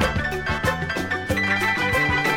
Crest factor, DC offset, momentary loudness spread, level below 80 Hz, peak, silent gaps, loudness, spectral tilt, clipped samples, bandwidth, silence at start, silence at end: 14 dB; under 0.1%; 5 LU; -36 dBFS; -8 dBFS; none; -22 LUFS; -4.5 dB/octave; under 0.1%; 18 kHz; 0 s; 0 s